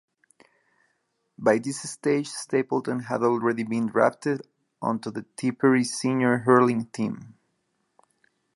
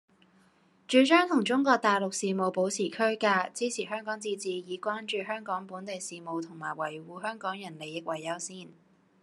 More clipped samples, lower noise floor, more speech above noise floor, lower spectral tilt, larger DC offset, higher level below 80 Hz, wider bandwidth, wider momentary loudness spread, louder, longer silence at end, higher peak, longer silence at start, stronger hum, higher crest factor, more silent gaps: neither; first, -74 dBFS vs -64 dBFS; first, 50 dB vs 35 dB; first, -5.5 dB/octave vs -3.5 dB/octave; neither; first, -74 dBFS vs -86 dBFS; about the same, 11.5 kHz vs 12.5 kHz; about the same, 11 LU vs 13 LU; first, -25 LUFS vs -30 LUFS; first, 1.25 s vs 0.5 s; first, -4 dBFS vs -8 dBFS; first, 1.4 s vs 0.9 s; neither; about the same, 22 dB vs 22 dB; neither